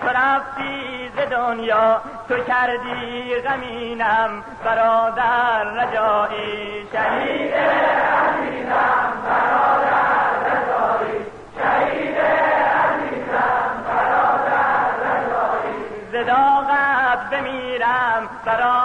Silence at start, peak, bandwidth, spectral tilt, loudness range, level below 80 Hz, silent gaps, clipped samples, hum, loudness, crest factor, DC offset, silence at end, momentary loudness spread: 0 s; -8 dBFS; 9.8 kHz; -5.5 dB/octave; 3 LU; -52 dBFS; none; under 0.1%; none; -19 LUFS; 12 dB; under 0.1%; 0 s; 9 LU